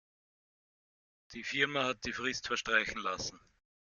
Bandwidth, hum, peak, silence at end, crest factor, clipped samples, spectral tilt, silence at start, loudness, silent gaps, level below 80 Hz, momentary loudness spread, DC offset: 7.4 kHz; none; -14 dBFS; 0.55 s; 24 dB; under 0.1%; -2.5 dB/octave; 1.3 s; -34 LUFS; none; -64 dBFS; 11 LU; under 0.1%